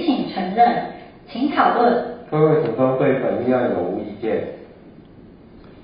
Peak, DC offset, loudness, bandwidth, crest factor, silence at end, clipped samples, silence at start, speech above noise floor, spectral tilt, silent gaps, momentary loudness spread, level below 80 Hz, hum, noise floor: -2 dBFS; under 0.1%; -19 LUFS; 5.2 kHz; 18 dB; 0 s; under 0.1%; 0 s; 26 dB; -11.5 dB/octave; none; 13 LU; -54 dBFS; none; -44 dBFS